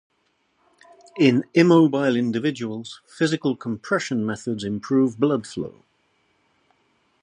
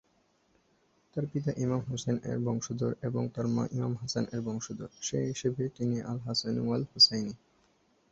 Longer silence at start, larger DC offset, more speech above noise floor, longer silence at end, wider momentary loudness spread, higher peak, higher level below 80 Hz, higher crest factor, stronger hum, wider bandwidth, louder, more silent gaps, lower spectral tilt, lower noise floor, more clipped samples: about the same, 1.15 s vs 1.15 s; neither; first, 47 dB vs 39 dB; first, 1.55 s vs 0.75 s; first, 16 LU vs 13 LU; first, -2 dBFS vs -10 dBFS; about the same, -64 dBFS vs -64 dBFS; about the same, 20 dB vs 22 dB; neither; first, 10.5 kHz vs 8 kHz; first, -22 LUFS vs -31 LUFS; neither; first, -6.5 dB/octave vs -5 dB/octave; about the same, -68 dBFS vs -70 dBFS; neither